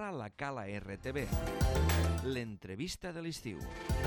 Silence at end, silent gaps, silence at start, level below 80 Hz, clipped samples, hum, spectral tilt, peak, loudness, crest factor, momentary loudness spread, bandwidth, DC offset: 0 s; none; 0 s; -42 dBFS; under 0.1%; none; -5.5 dB/octave; -20 dBFS; -37 LUFS; 16 dB; 11 LU; 17.5 kHz; under 0.1%